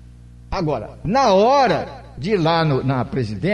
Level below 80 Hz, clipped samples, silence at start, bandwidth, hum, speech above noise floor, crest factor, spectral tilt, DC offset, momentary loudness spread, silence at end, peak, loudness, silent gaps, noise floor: -40 dBFS; under 0.1%; 0.5 s; 10 kHz; none; 23 dB; 14 dB; -6.5 dB/octave; under 0.1%; 12 LU; 0 s; -6 dBFS; -18 LUFS; none; -41 dBFS